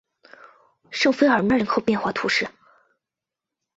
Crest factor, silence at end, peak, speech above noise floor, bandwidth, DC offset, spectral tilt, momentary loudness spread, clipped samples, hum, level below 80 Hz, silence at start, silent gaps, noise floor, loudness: 18 dB; 1.3 s; -6 dBFS; 67 dB; 8 kHz; under 0.1%; -4.5 dB/octave; 8 LU; under 0.1%; none; -58 dBFS; 0.9 s; none; -87 dBFS; -21 LUFS